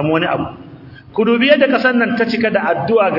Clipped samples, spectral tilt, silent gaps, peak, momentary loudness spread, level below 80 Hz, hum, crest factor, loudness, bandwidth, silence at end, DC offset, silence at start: under 0.1%; -7.5 dB/octave; none; 0 dBFS; 10 LU; -54 dBFS; none; 14 dB; -14 LUFS; 5.8 kHz; 0 s; under 0.1%; 0 s